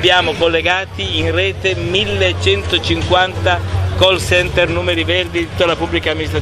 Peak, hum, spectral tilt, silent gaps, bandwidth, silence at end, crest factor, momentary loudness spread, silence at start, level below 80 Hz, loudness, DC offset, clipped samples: 0 dBFS; none; -4.5 dB/octave; none; 14 kHz; 0 s; 14 dB; 5 LU; 0 s; -32 dBFS; -15 LUFS; under 0.1%; under 0.1%